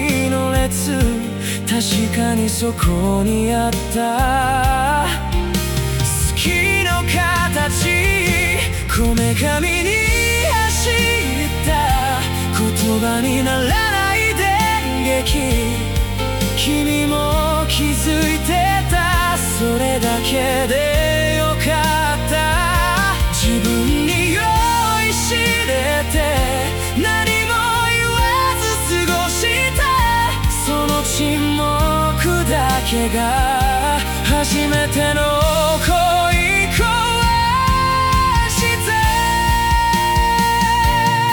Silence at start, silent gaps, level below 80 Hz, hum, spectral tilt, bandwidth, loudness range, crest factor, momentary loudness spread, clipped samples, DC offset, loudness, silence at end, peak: 0 s; none; -24 dBFS; none; -4 dB/octave; 18 kHz; 2 LU; 12 dB; 3 LU; under 0.1%; under 0.1%; -16 LUFS; 0 s; -4 dBFS